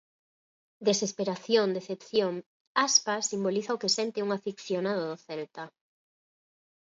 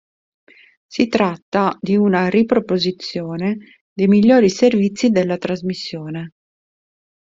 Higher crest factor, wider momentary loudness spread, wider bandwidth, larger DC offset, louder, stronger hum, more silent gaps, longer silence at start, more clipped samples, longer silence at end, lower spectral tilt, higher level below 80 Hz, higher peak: first, 22 dB vs 16 dB; about the same, 15 LU vs 16 LU; about the same, 7.8 kHz vs 7.8 kHz; neither; second, -29 LUFS vs -17 LUFS; neither; about the same, 2.46-2.75 s vs 1.42-1.52 s, 3.81-3.96 s; about the same, 0.8 s vs 0.9 s; neither; first, 1.15 s vs 1 s; second, -2.5 dB/octave vs -6.5 dB/octave; second, -80 dBFS vs -58 dBFS; second, -8 dBFS vs -2 dBFS